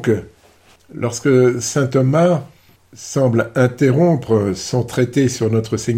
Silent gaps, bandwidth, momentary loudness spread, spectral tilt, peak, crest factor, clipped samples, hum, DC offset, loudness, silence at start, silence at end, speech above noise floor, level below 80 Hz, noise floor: none; 15.5 kHz; 9 LU; -6.5 dB/octave; -4 dBFS; 14 dB; under 0.1%; none; under 0.1%; -17 LUFS; 0 s; 0 s; 34 dB; -52 dBFS; -50 dBFS